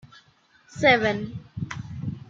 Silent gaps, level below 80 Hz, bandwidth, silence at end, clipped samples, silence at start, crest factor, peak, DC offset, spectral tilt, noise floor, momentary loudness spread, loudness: none; -56 dBFS; 7.6 kHz; 0.1 s; under 0.1%; 0.15 s; 22 dB; -4 dBFS; under 0.1%; -5.5 dB/octave; -59 dBFS; 17 LU; -23 LUFS